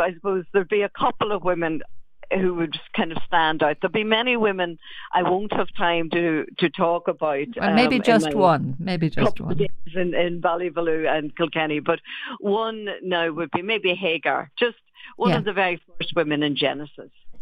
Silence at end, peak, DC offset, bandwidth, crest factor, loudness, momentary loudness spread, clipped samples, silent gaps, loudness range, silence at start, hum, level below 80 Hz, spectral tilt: 0 s; -4 dBFS; under 0.1%; 11.5 kHz; 18 dB; -23 LUFS; 8 LU; under 0.1%; none; 3 LU; 0 s; none; -50 dBFS; -6 dB/octave